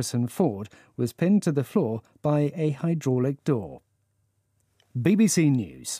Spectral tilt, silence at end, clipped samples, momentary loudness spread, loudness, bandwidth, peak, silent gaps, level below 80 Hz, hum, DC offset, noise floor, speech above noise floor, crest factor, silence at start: -6.5 dB/octave; 0 s; under 0.1%; 11 LU; -25 LUFS; 15.5 kHz; -8 dBFS; none; -66 dBFS; none; under 0.1%; -71 dBFS; 47 dB; 16 dB; 0 s